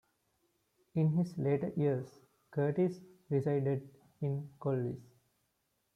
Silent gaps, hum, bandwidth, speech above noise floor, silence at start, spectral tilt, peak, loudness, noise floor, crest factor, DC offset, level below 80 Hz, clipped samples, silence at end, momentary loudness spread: none; none; 10 kHz; 47 dB; 0.95 s; -10 dB/octave; -20 dBFS; -35 LUFS; -80 dBFS; 16 dB; under 0.1%; -74 dBFS; under 0.1%; 0.95 s; 9 LU